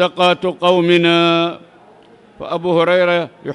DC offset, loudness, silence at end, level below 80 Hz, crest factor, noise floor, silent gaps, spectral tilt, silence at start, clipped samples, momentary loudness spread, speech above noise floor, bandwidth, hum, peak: under 0.1%; -14 LUFS; 0 s; -60 dBFS; 14 dB; -45 dBFS; none; -6 dB/octave; 0 s; under 0.1%; 11 LU; 31 dB; 11 kHz; none; 0 dBFS